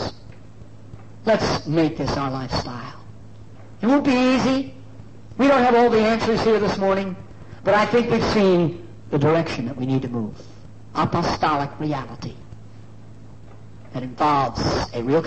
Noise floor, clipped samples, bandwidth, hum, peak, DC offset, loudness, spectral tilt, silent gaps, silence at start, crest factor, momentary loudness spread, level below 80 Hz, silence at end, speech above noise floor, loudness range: -44 dBFS; under 0.1%; 8.6 kHz; none; -6 dBFS; 0.8%; -21 LUFS; -6.5 dB/octave; none; 0 s; 14 dB; 17 LU; -46 dBFS; 0 s; 24 dB; 8 LU